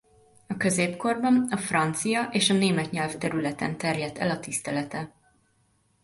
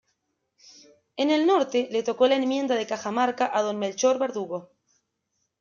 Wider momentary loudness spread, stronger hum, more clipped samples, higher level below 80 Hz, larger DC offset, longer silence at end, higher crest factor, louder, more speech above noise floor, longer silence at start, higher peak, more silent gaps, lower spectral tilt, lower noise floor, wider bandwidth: about the same, 8 LU vs 9 LU; neither; neither; first, -62 dBFS vs -76 dBFS; neither; about the same, 0.95 s vs 0.95 s; about the same, 20 dB vs 18 dB; about the same, -26 LUFS vs -24 LUFS; second, 41 dB vs 53 dB; second, 0.5 s vs 1.15 s; about the same, -8 dBFS vs -8 dBFS; neither; about the same, -4 dB/octave vs -3.5 dB/octave; second, -67 dBFS vs -77 dBFS; first, 12 kHz vs 7.4 kHz